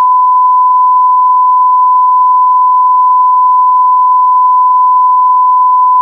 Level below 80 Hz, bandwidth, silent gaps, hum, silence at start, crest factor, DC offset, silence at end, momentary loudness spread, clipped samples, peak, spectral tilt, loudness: under -90 dBFS; 1.2 kHz; none; none; 0 s; 4 dB; under 0.1%; 0 s; 0 LU; under 0.1%; -2 dBFS; -3 dB/octave; -7 LUFS